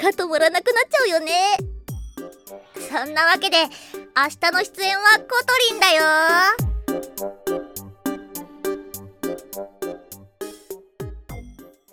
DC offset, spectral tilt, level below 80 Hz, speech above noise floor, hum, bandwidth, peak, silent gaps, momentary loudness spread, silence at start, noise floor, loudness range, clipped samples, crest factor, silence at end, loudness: under 0.1%; -2.5 dB/octave; -42 dBFS; 26 dB; none; 17.5 kHz; -2 dBFS; none; 22 LU; 0 s; -44 dBFS; 15 LU; under 0.1%; 20 dB; 0.3 s; -19 LUFS